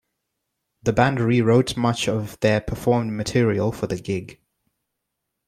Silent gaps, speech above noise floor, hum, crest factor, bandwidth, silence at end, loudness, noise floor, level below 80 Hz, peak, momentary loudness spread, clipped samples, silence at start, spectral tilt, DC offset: none; 59 dB; none; 18 dB; 15 kHz; 1.15 s; -22 LUFS; -80 dBFS; -46 dBFS; -4 dBFS; 9 LU; under 0.1%; 0.85 s; -6 dB/octave; under 0.1%